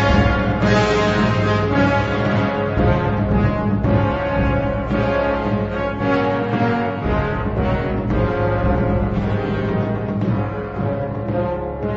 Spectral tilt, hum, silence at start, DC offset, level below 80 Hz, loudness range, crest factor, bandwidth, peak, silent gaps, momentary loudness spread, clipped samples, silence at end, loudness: -7.5 dB/octave; none; 0 s; under 0.1%; -28 dBFS; 3 LU; 16 dB; 7.8 kHz; -2 dBFS; none; 5 LU; under 0.1%; 0 s; -19 LUFS